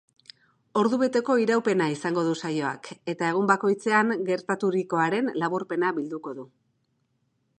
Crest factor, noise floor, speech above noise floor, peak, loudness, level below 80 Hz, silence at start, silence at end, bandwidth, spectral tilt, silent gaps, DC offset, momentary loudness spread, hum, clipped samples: 20 dB; -73 dBFS; 48 dB; -6 dBFS; -25 LUFS; -78 dBFS; 0.75 s; 1.15 s; 9.8 kHz; -6 dB/octave; none; under 0.1%; 10 LU; none; under 0.1%